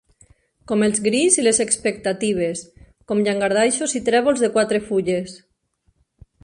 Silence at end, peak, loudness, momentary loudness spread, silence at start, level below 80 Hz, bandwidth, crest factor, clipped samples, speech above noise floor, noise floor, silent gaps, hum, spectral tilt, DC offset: 1.05 s; 0 dBFS; -19 LUFS; 9 LU; 0.7 s; -56 dBFS; 11.5 kHz; 20 dB; under 0.1%; 47 dB; -66 dBFS; none; none; -3.5 dB/octave; under 0.1%